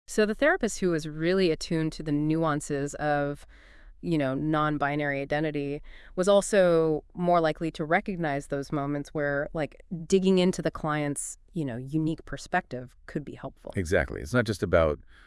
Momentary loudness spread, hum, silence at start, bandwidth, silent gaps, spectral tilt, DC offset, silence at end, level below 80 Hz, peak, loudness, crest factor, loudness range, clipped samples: 12 LU; none; 0.1 s; 12 kHz; none; -5.5 dB/octave; under 0.1%; 0.25 s; -48 dBFS; -8 dBFS; -27 LUFS; 18 dB; 5 LU; under 0.1%